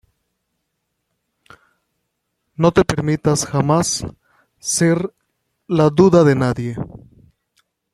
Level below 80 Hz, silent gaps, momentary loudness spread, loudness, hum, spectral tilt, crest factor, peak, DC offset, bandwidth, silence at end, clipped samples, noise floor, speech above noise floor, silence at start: -46 dBFS; none; 17 LU; -17 LUFS; none; -5.5 dB/octave; 18 dB; 0 dBFS; under 0.1%; 14 kHz; 1.05 s; under 0.1%; -74 dBFS; 59 dB; 2.6 s